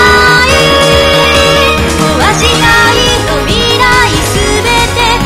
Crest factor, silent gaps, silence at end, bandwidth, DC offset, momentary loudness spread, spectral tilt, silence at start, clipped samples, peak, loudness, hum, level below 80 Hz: 8 dB; none; 0 s; 17 kHz; under 0.1%; 4 LU; -3.5 dB/octave; 0 s; 2%; 0 dBFS; -6 LUFS; none; -20 dBFS